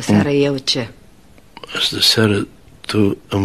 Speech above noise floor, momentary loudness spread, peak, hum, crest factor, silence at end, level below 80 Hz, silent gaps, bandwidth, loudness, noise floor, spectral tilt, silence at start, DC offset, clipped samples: 31 dB; 16 LU; 0 dBFS; none; 18 dB; 0 s; -50 dBFS; none; 13 kHz; -16 LUFS; -47 dBFS; -4.5 dB/octave; 0 s; 0.4%; under 0.1%